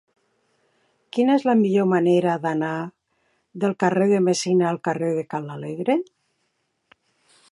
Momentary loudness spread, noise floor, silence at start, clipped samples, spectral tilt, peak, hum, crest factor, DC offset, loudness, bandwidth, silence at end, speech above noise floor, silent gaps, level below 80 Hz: 12 LU; -72 dBFS; 1.15 s; under 0.1%; -6 dB/octave; -4 dBFS; none; 18 dB; under 0.1%; -22 LUFS; 11.5 kHz; 1.5 s; 52 dB; none; -72 dBFS